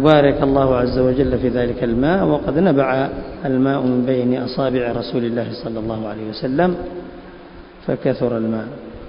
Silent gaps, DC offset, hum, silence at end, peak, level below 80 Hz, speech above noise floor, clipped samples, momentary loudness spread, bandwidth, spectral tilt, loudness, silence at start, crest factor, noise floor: none; under 0.1%; none; 0 s; 0 dBFS; -38 dBFS; 21 dB; under 0.1%; 11 LU; 5.4 kHz; -9.5 dB/octave; -18 LUFS; 0 s; 18 dB; -39 dBFS